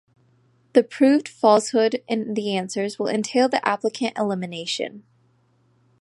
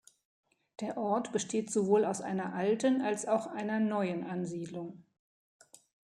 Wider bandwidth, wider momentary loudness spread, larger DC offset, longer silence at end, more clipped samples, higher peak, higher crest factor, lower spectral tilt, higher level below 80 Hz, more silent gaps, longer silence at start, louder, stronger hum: about the same, 11.5 kHz vs 11.5 kHz; about the same, 9 LU vs 11 LU; neither; second, 1 s vs 1.2 s; neither; first, -2 dBFS vs -14 dBFS; about the same, 20 dB vs 20 dB; about the same, -4.5 dB/octave vs -5.5 dB/octave; first, -74 dBFS vs -80 dBFS; neither; about the same, 0.75 s vs 0.8 s; first, -22 LUFS vs -33 LUFS; neither